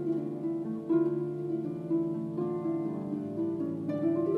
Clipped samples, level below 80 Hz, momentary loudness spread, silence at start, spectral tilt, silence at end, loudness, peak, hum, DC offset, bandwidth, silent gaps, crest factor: under 0.1%; -72 dBFS; 6 LU; 0 s; -10.5 dB/octave; 0 s; -32 LUFS; -18 dBFS; none; under 0.1%; 3.8 kHz; none; 14 dB